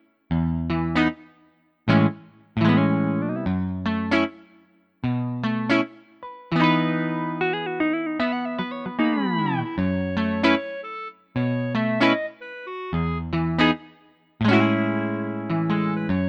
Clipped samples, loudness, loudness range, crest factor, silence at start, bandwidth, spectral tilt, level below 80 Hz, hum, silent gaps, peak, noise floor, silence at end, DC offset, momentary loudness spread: under 0.1%; -23 LUFS; 2 LU; 18 dB; 0.3 s; 7.8 kHz; -8 dB/octave; -46 dBFS; none; none; -4 dBFS; -60 dBFS; 0 s; under 0.1%; 12 LU